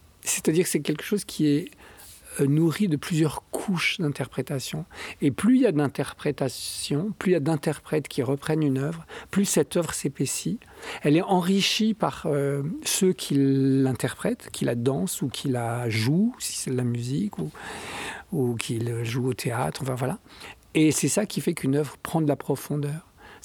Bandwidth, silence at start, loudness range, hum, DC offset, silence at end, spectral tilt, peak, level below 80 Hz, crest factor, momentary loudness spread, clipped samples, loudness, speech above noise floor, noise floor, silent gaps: 19.5 kHz; 0.25 s; 4 LU; none; under 0.1%; 0.05 s; -5 dB/octave; -6 dBFS; -58 dBFS; 20 dB; 10 LU; under 0.1%; -26 LUFS; 22 dB; -47 dBFS; none